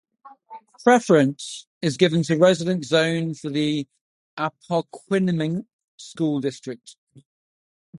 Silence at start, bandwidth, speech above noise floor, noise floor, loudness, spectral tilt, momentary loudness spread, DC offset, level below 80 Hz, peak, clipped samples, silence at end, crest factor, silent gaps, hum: 0.25 s; 11.5 kHz; 24 dB; -45 dBFS; -22 LUFS; -5.5 dB/octave; 18 LU; under 0.1%; -68 dBFS; -2 dBFS; under 0.1%; 0 s; 20 dB; 1.67-1.81 s, 4.01-4.37 s, 5.73-5.98 s, 6.98-7.07 s, 7.25-7.93 s; none